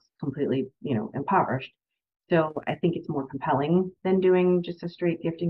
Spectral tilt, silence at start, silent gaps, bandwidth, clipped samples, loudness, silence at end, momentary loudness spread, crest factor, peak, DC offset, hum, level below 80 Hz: -10 dB/octave; 0.2 s; none; 5.8 kHz; under 0.1%; -26 LUFS; 0 s; 10 LU; 16 dB; -10 dBFS; under 0.1%; none; -64 dBFS